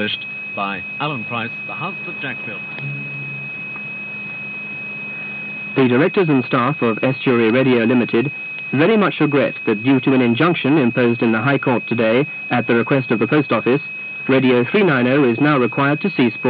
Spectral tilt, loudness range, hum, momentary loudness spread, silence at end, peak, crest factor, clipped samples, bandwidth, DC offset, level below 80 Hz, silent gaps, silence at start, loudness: -5 dB/octave; 9 LU; none; 11 LU; 0 s; -2 dBFS; 16 dB; under 0.1%; 5 kHz; under 0.1%; -64 dBFS; none; 0 s; -18 LUFS